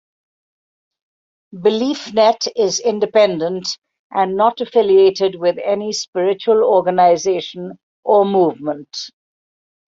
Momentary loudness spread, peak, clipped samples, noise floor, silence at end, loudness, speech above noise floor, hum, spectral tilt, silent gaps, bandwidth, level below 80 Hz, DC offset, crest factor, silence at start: 14 LU; -2 dBFS; under 0.1%; under -90 dBFS; 0.8 s; -16 LUFS; over 74 dB; none; -4 dB/octave; 3.78-3.82 s, 3.99-4.10 s, 6.08-6.13 s, 7.83-8.03 s; 7.8 kHz; -64 dBFS; under 0.1%; 16 dB; 1.55 s